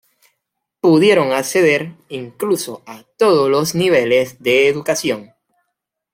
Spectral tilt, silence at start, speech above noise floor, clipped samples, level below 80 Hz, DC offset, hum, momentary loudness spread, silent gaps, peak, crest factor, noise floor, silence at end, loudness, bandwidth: -4.5 dB/octave; 0.85 s; 61 dB; under 0.1%; -60 dBFS; under 0.1%; none; 15 LU; none; -2 dBFS; 16 dB; -76 dBFS; 0.9 s; -15 LUFS; 16.5 kHz